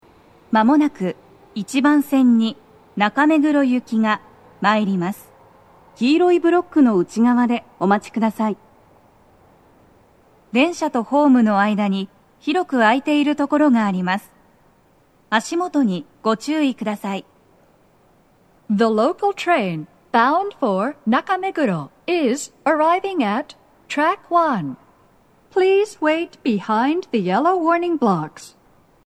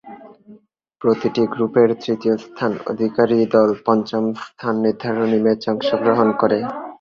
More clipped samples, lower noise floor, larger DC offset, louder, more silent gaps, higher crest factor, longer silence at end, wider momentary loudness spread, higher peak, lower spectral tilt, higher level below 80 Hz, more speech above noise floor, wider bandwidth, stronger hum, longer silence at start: neither; first, -56 dBFS vs -49 dBFS; neither; about the same, -19 LUFS vs -19 LUFS; neither; about the same, 18 dB vs 16 dB; first, 0.6 s vs 0.05 s; first, 10 LU vs 7 LU; about the same, 0 dBFS vs -2 dBFS; second, -6 dB/octave vs -7.5 dB/octave; about the same, -64 dBFS vs -60 dBFS; first, 38 dB vs 31 dB; first, 13 kHz vs 7 kHz; neither; first, 0.5 s vs 0.05 s